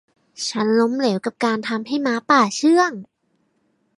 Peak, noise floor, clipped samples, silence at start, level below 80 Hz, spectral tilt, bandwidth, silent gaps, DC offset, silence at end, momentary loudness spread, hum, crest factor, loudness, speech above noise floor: -2 dBFS; -67 dBFS; under 0.1%; 0.4 s; -72 dBFS; -4 dB/octave; 11.5 kHz; none; under 0.1%; 0.95 s; 8 LU; none; 18 dB; -19 LUFS; 48 dB